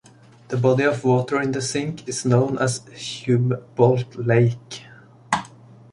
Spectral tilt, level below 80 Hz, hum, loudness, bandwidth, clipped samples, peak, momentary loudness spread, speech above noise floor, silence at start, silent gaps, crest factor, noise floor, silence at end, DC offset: -6 dB/octave; -58 dBFS; none; -21 LUFS; 11.5 kHz; under 0.1%; -2 dBFS; 11 LU; 25 dB; 0.5 s; none; 18 dB; -45 dBFS; 0.45 s; under 0.1%